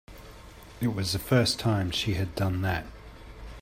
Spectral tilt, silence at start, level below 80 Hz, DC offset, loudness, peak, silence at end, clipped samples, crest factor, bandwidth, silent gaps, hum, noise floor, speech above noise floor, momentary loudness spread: -5 dB/octave; 0.1 s; -48 dBFS; under 0.1%; -28 LUFS; -10 dBFS; 0 s; under 0.1%; 20 dB; 16 kHz; none; none; -47 dBFS; 20 dB; 24 LU